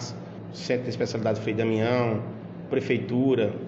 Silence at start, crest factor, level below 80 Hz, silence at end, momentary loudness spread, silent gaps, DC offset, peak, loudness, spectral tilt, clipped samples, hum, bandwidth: 0 s; 16 dB; -62 dBFS; 0 s; 13 LU; none; under 0.1%; -10 dBFS; -26 LUFS; -6.5 dB/octave; under 0.1%; none; 8 kHz